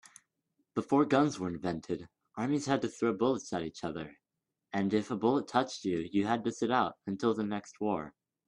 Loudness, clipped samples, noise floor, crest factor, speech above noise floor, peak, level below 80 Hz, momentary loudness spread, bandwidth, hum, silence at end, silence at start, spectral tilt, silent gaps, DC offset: -32 LUFS; under 0.1%; -88 dBFS; 20 dB; 56 dB; -12 dBFS; -70 dBFS; 11 LU; 11 kHz; none; 0.4 s; 0.75 s; -6 dB/octave; none; under 0.1%